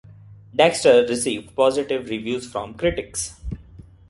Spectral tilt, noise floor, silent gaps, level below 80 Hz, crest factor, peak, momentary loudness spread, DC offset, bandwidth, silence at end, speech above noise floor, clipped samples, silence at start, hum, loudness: -3.5 dB/octave; -45 dBFS; none; -44 dBFS; 20 dB; -2 dBFS; 15 LU; under 0.1%; 11.5 kHz; 0.3 s; 25 dB; under 0.1%; 0.1 s; none; -21 LUFS